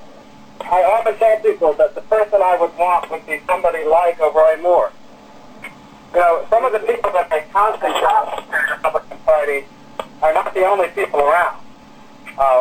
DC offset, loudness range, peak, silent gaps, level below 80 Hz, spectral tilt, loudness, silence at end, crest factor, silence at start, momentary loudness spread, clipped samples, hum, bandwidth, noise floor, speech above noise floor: under 0.1%; 2 LU; -2 dBFS; none; -50 dBFS; -3.5 dB/octave; -16 LUFS; 0 s; 14 dB; 0 s; 10 LU; under 0.1%; none; 15 kHz; -42 dBFS; 26 dB